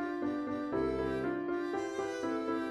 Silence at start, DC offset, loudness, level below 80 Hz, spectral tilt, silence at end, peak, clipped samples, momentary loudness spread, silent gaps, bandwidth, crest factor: 0 s; under 0.1%; -35 LUFS; -58 dBFS; -6 dB/octave; 0 s; -22 dBFS; under 0.1%; 3 LU; none; 11.5 kHz; 12 dB